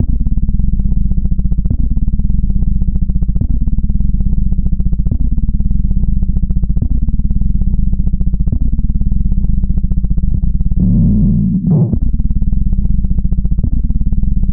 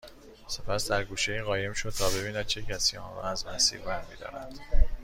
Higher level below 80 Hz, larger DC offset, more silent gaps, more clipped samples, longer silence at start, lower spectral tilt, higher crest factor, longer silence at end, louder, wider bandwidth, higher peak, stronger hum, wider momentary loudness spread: first, -14 dBFS vs -34 dBFS; neither; neither; neither; about the same, 0 s vs 0.05 s; first, -16.5 dB/octave vs -2.5 dB/octave; second, 10 dB vs 20 dB; about the same, 0 s vs 0 s; first, -16 LUFS vs -30 LUFS; second, 1.1 kHz vs 16 kHz; first, 0 dBFS vs -8 dBFS; neither; second, 5 LU vs 15 LU